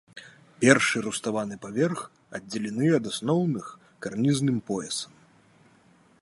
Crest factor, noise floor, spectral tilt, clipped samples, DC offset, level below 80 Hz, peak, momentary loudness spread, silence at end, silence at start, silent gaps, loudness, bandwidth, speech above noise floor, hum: 26 dB; -59 dBFS; -5 dB/octave; under 0.1%; under 0.1%; -68 dBFS; -2 dBFS; 18 LU; 1.15 s; 0.15 s; none; -26 LUFS; 11.5 kHz; 34 dB; none